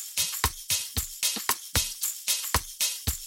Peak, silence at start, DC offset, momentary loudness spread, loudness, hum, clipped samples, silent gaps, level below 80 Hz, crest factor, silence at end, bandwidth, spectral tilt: -10 dBFS; 0 s; under 0.1%; 3 LU; -27 LUFS; none; under 0.1%; none; -42 dBFS; 20 dB; 0 s; 17 kHz; -1 dB/octave